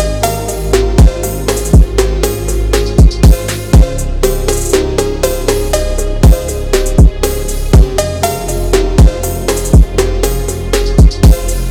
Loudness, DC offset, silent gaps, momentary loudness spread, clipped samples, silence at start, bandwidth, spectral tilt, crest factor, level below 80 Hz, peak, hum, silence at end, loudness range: -12 LUFS; under 0.1%; none; 6 LU; 0.6%; 0 s; 18 kHz; -5.5 dB/octave; 10 dB; -12 dBFS; 0 dBFS; none; 0 s; 1 LU